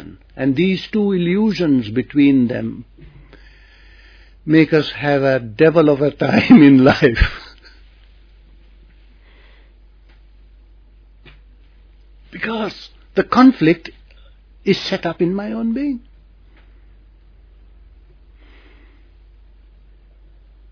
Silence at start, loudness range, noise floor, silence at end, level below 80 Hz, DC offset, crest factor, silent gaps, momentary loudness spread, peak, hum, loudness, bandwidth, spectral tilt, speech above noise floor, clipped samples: 0 s; 15 LU; -46 dBFS; 4.75 s; -38 dBFS; under 0.1%; 18 dB; none; 16 LU; 0 dBFS; none; -15 LUFS; 5.4 kHz; -7.5 dB/octave; 32 dB; under 0.1%